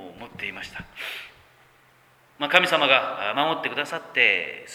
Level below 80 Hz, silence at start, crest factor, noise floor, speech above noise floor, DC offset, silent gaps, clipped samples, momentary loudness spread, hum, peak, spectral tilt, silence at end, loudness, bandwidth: -64 dBFS; 0 s; 26 dB; -58 dBFS; 34 dB; under 0.1%; none; under 0.1%; 17 LU; none; 0 dBFS; -3 dB/octave; 0 s; -22 LUFS; 19.5 kHz